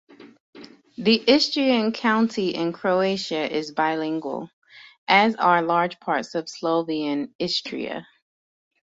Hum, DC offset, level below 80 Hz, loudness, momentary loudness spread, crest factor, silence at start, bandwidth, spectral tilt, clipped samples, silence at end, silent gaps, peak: none; under 0.1%; -68 dBFS; -22 LUFS; 13 LU; 20 dB; 0.2 s; 7.8 kHz; -4.5 dB/octave; under 0.1%; 0.8 s; 0.40-0.53 s, 4.53-4.62 s, 4.98-5.07 s, 7.35-7.39 s; -2 dBFS